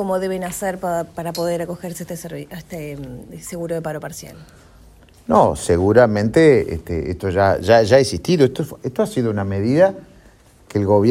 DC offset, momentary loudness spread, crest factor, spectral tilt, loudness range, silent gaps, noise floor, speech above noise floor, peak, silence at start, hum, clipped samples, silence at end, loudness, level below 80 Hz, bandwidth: under 0.1%; 18 LU; 18 dB; -6 dB/octave; 13 LU; none; -49 dBFS; 31 dB; 0 dBFS; 0 s; none; under 0.1%; 0 s; -18 LUFS; -46 dBFS; 16 kHz